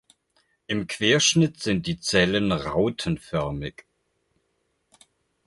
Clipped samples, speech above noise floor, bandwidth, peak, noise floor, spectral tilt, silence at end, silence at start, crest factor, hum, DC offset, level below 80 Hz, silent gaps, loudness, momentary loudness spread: under 0.1%; 49 dB; 11.5 kHz; -6 dBFS; -73 dBFS; -4 dB/octave; 1.75 s; 0.7 s; 20 dB; none; under 0.1%; -50 dBFS; none; -23 LUFS; 12 LU